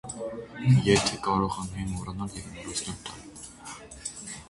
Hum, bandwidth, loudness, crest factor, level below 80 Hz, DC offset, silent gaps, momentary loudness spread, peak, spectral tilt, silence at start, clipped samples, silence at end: none; 11.5 kHz; -28 LUFS; 22 dB; -48 dBFS; under 0.1%; none; 19 LU; -8 dBFS; -5 dB/octave; 0.05 s; under 0.1%; 0 s